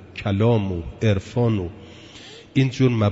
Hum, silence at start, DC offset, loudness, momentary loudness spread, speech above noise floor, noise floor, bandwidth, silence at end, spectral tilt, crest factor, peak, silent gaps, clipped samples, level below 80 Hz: none; 0 s; under 0.1%; -22 LUFS; 21 LU; 23 dB; -43 dBFS; 8 kHz; 0 s; -7.5 dB/octave; 14 dB; -6 dBFS; none; under 0.1%; -46 dBFS